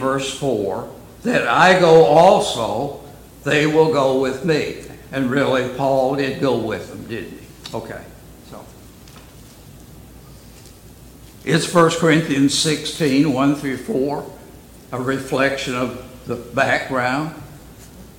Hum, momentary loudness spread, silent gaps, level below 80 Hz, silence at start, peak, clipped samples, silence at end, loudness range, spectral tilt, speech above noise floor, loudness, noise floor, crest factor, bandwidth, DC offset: none; 18 LU; none; -48 dBFS; 0 s; 0 dBFS; under 0.1%; 0.15 s; 14 LU; -5 dB/octave; 25 dB; -18 LUFS; -42 dBFS; 18 dB; 17 kHz; under 0.1%